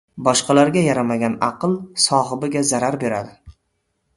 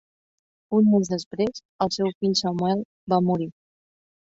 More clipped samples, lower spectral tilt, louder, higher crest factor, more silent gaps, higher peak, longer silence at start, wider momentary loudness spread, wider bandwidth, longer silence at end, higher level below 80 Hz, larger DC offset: neither; second, -4 dB/octave vs -6 dB/octave; first, -18 LUFS vs -24 LUFS; about the same, 18 dB vs 18 dB; second, none vs 1.26-1.31 s, 1.65-1.79 s, 2.15-2.21 s, 2.85-3.07 s; first, 0 dBFS vs -8 dBFS; second, 0.15 s vs 0.7 s; about the same, 8 LU vs 9 LU; first, 12 kHz vs 8 kHz; second, 0.65 s vs 0.8 s; first, -54 dBFS vs -62 dBFS; neither